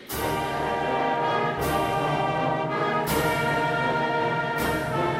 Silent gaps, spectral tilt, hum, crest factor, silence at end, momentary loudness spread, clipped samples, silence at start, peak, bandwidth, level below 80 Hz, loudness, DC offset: none; -5 dB/octave; none; 14 dB; 0 s; 3 LU; under 0.1%; 0 s; -12 dBFS; 16 kHz; -46 dBFS; -25 LUFS; under 0.1%